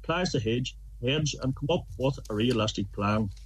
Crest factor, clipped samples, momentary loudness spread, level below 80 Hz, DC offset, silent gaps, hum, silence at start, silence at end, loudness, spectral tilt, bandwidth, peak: 16 dB; under 0.1%; 5 LU; -44 dBFS; under 0.1%; none; none; 0 s; 0 s; -29 LUFS; -5.5 dB/octave; 13 kHz; -14 dBFS